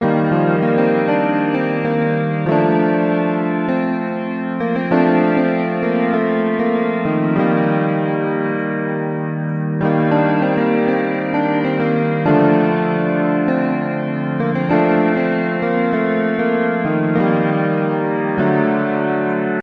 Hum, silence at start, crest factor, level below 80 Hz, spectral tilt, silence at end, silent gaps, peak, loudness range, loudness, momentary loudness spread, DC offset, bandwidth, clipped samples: none; 0 s; 16 dB; -56 dBFS; -10 dB/octave; 0 s; none; -2 dBFS; 2 LU; -17 LUFS; 5 LU; under 0.1%; 5.4 kHz; under 0.1%